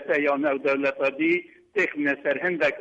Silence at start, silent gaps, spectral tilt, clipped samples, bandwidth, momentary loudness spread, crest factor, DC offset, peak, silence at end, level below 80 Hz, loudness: 0 s; none; -6 dB/octave; under 0.1%; 8 kHz; 3 LU; 12 dB; under 0.1%; -12 dBFS; 0 s; -70 dBFS; -24 LUFS